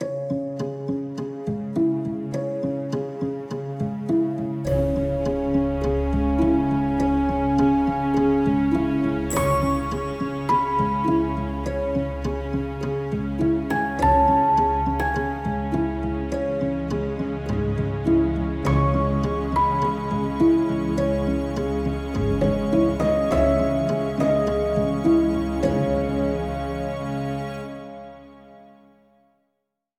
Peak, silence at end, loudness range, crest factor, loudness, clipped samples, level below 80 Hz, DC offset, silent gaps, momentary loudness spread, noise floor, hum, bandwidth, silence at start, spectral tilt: -8 dBFS; 1.35 s; 5 LU; 14 dB; -23 LUFS; under 0.1%; -34 dBFS; under 0.1%; none; 8 LU; -78 dBFS; none; 17.5 kHz; 0 s; -7.5 dB/octave